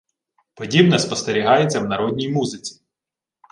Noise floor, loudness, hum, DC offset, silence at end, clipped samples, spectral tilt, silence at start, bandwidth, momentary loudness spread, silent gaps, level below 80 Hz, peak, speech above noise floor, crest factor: -88 dBFS; -18 LUFS; none; under 0.1%; 0.8 s; under 0.1%; -5 dB/octave; 0.6 s; 11 kHz; 16 LU; none; -58 dBFS; -2 dBFS; 69 dB; 18 dB